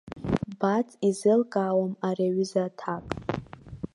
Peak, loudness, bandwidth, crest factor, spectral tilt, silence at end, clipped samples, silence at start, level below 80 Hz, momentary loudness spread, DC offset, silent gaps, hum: -10 dBFS; -27 LUFS; 11.5 kHz; 18 dB; -7 dB/octave; 0.1 s; under 0.1%; 0.05 s; -52 dBFS; 11 LU; under 0.1%; none; none